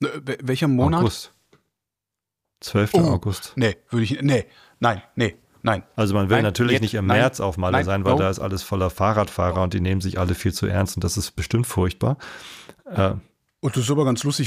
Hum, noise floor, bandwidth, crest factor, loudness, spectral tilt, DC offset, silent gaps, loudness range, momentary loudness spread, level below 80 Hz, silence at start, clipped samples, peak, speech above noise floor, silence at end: none; -86 dBFS; 15.5 kHz; 16 dB; -22 LUFS; -6 dB/octave; under 0.1%; none; 4 LU; 9 LU; -44 dBFS; 0 s; under 0.1%; -4 dBFS; 65 dB; 0 s